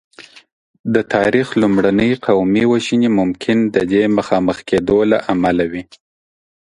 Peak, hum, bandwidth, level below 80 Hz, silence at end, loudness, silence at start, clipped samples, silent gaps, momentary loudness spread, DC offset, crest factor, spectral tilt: 0 dBFS; none; 10.5 kHz; -46 dBFS; 0.8 s; -15 LUFS; 0.2 s; under 0.1%; 0.52-0.84 s; 5 LU; under 0.1%; 16 dB; -6.5 dB/octave